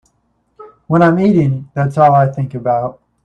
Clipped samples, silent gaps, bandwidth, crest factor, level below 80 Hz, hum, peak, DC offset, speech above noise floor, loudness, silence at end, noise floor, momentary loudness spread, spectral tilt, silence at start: under 0.1%; none; 8.6 kHz; 14 dB; -50 dBFS; none; 0 dBFS; under 0.1%; 50 dB; -13 LUFS; 0.3 s; -62 dBFS; 8 LU; -9.5 dB/octave; 0.6 s